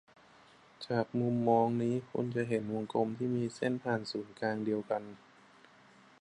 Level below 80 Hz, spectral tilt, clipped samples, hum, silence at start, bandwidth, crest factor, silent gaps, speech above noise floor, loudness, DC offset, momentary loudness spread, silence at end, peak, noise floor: -74 dBFS; -7.5 dB/octave; under 0.1%; none; 0.8 s; 10.5 kHz; 20 dB; none; 28 dB; -34 LUFS; under 0.1%; 9 LU; 1.05 s; -16 dBFS; -61 dBFS